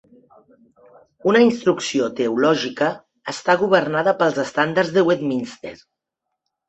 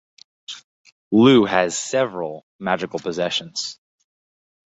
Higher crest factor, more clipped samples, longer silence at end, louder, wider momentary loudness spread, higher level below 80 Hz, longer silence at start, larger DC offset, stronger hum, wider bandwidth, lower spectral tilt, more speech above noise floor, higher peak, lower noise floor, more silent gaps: about the same, 18 dB vs 20 dB; neither; about the same, 0.95 s vs 0.95 s; about the same, -19 LUFS vs -20 LUFS; second, 12 LU vs 23 LU; about the same, -64 dBFS vs -60 dBFS; first, 1.25 s vs 0.5 s; neither; neither; about the same, 8.4 kHz vs 8 kHz; about the same, -5 dB/octave vs -4.5 dB/octave; second, 61 dB vs over 71 dB; about the same, -2 dBFS vs -2 dBFS; second, -81 dBFS vs under -90 dBFS; second, none vs 0.64-0.85 s, 0.92-1.11 s, 2.43-2.59 s